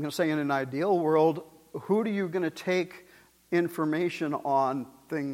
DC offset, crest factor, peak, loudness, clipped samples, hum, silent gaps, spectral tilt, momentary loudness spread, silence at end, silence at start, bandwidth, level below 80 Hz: under 0.1%; 16 dB; -12 dBFS; -28 LUFS; under 0.1%; none; none; -6.5 dB/octave; 12 LU; 0 s; 0 s; 16.5 kHz; -74 dBFS